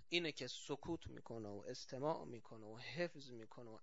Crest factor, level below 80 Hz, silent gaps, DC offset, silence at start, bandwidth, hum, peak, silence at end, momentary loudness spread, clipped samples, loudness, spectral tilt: 24 dB; -72 dBFS; none; under 0.1%; 0 s; 7.6 kHz; none; -24 dBFS; 0.05 s; 13 LU; under 0.1%; -48 LUFS; -3 dB/octave